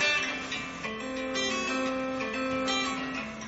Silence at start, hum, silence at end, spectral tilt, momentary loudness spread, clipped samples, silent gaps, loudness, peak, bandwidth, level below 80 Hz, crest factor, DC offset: 0 s; none; 0 s; -1 dB/octave; 6 LU; under 0.1%; none; -30 LUFS; -14 dBFS; 8 kHz; -58 dBFS; 16 dB; under 0.1%